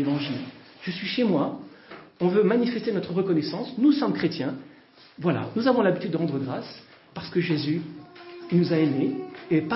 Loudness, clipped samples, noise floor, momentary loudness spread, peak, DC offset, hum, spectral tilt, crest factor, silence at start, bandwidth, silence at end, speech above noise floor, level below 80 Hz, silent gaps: -25 LUFS; under 0.1%; -52 dBFS; 20 LU; -8 dBFS; under 0.1%; none; -10.5 dB/octave; 16 dB; 0 s; 5.8 kHz; 0 s; 28 dB; -68 dBFS; none